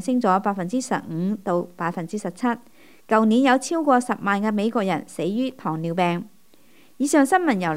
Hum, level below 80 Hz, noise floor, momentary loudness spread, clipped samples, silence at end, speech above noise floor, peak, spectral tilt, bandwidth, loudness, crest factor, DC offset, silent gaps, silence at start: none; -70 dBFS; -56 dBFS; 10 LU; under 0.1%; 0 s; 34 dB; -4 dBFS; -5.5 dB/octave; 16 kHz; -22 LUFS; 18 dB; 0.3%; none; 0 s